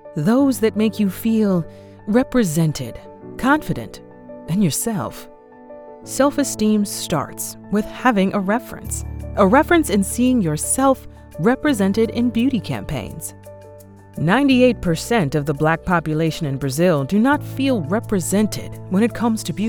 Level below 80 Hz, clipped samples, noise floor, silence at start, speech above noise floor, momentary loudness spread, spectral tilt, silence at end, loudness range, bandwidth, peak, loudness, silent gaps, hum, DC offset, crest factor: -40 dBFS; under 0.1%; -42 dBFS; 0.05 s; 23 dB; 13 LU; -5.5 dB/octave; 0 s; 4 LU; 19.5 kHz; -2 dBFS; -19 LUFS; none; none; under 0.1%; 18 dB